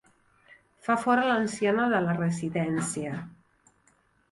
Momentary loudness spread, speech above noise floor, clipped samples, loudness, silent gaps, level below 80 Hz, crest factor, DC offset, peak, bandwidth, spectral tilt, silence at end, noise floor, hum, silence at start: 13 LU; 40 dB; under 0.1%; -27 LUFS; none; -66 dBFS; 16 dB; under 0.1%; -12 dBFS; 11.5 kHz; -5.5 dB/octave; 1 s; -66 dBFS; none; 0.85 s